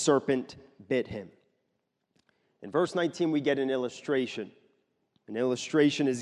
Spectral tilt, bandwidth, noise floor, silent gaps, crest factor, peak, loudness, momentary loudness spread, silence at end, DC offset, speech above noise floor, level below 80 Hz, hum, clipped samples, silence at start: -5 dB/octave; 11.5 kHz; -79 dBFS; none; 18 dB; -12 dBFS; -29 LUFS; 15 LU; 0 s; under 0.1%; 51 dB; -68 dBFS; none; under 0.1%; 0 s